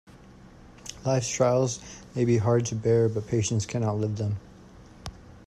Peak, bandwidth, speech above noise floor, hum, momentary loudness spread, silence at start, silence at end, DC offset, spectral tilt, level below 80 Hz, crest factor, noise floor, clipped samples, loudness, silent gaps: -10 dBFS; 11 kHz; 25 dB; none; 19 LU; 0.7 s; 0.05 s; under 0.1%; -6 dB/octave; -54 dBFS; 18 dB; -50 dBFS; under 0.1%; -26 LUFS; none